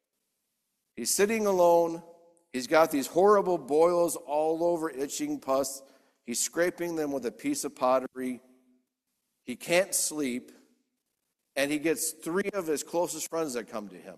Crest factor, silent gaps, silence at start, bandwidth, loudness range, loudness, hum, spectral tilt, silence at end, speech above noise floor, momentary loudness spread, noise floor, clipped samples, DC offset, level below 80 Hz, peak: 22 dB; none; 0.95 s; 14.5 kHz; 7 LU; -28 LUFS; none; -3.5 dB/octave; 0 s; 54 dB; 14 LU; -82 dBFS; under 0.1%; under 0.1%; -72 dBFS; -8 dBFS